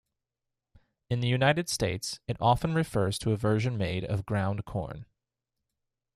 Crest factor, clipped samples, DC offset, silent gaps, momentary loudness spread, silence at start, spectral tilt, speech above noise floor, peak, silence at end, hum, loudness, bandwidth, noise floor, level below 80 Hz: 20 dB; under 0.1%; under 0.1%; none; 9 LU; 1.1 s; -5.5 dB/octave; 59 dB; -10 dBFS; 1.1 s; none; -29 LUFS; 14 kHz; -87 dBFS; -52 dBFS